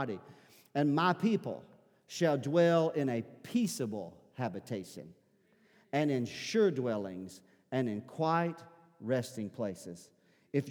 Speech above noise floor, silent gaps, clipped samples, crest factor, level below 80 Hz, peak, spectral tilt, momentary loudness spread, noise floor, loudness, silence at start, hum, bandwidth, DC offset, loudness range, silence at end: 36 dB; none; under 0.1%; 20 dB; -82 dBFS; -14 dBFS; -6 dB/octave; 17 LU; -69 dBFS; -33 LUFS; 0 s; none; 19.5 kHz; under 0.1%; 5 LU; 0 s